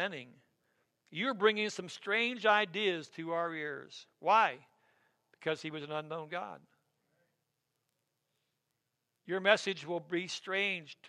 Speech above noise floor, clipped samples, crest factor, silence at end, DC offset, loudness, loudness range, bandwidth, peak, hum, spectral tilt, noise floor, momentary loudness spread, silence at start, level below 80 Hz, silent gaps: 50 dB; under 0.1%; 26 dB; 0 s; under 0.1%; -33 LUFS; 13 LU; 11.5 kHz; -10 dBFS; none; -3.5 dB/octave; -84 dBFS; 13 LU; 0 s; under -90 dBFS; none